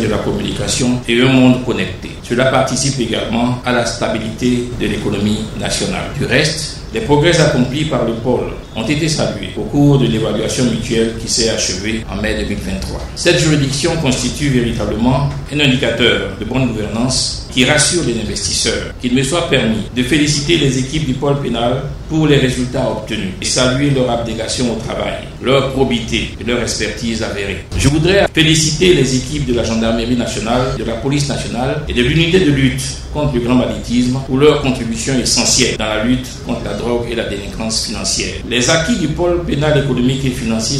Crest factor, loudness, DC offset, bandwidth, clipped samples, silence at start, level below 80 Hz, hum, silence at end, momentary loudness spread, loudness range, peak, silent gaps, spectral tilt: 14 dB; -15 LUFS; under 0.1%; 14.5 kHz; under 0.1%; 0 s; -30 dBFS; none; 0 s; 8 LU; 3 LU; 0 dBFS; none; -4.5 dB/octave